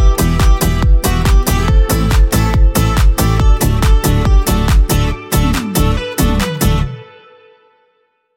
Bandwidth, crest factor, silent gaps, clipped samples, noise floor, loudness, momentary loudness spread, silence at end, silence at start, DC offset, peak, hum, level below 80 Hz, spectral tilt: 17 kHz; 12 dB; none; under 0.1%; -60 dBFS; -13 LUFS; 3 LU; 1.3 s; 0 s; under 0.1%; 0 dBFS; none; -14 dBFS; -5.5 dB/octave